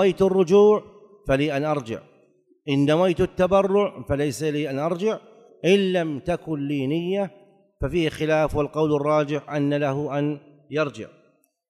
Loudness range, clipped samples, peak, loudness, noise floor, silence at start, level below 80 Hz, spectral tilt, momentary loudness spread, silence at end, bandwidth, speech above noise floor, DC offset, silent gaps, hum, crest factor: 3 LU; under 0.1%; -6 dBFS; -23 LUFS; -63 dBFS; 0 s; -46 dBFS; -6.5 dB/octave; 11 LU; 0.65 s; 13.5 kHz; 41 dB; under 0.1%; none; none; 16 dB